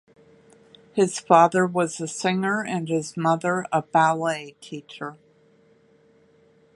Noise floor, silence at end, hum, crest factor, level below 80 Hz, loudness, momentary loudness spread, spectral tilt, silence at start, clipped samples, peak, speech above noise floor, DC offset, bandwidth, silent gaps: -58 dBFS; 1.6 s; none; 24 dB; -72 dBFS; -22 LUFS; 19 LU; -5 dB/octave; 0.95 s; under 0.1%; -2 dBFS; 36 dB; under 0.1%; 11.5 kHz; none